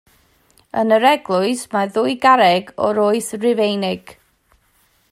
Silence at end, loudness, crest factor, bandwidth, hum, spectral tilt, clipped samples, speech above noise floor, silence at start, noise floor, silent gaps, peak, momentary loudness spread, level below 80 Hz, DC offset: 1.15 s; -17 LUFS; 18 dB; 16 kHz; none; -4.5 dB/octave; under 0.1%; 43 dB; 0.75 s; -59 dBFS; none; 0 dBFS; 9 LU; -62 dBFS; under 0.1%